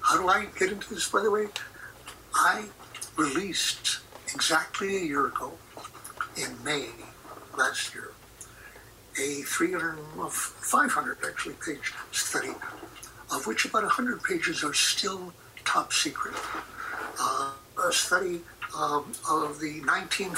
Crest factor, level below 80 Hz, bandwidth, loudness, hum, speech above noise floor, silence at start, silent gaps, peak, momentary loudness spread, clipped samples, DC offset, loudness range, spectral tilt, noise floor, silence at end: 18 dB; -62 dBFS; 16 kHz; -28 LUFS; none; 21 dB; 0 s; none; -12 dBFS; 18 LU; under 0.1%; under 0.1%; 5 LU; -1.5 dB/octave; -50 dBFS; 0 s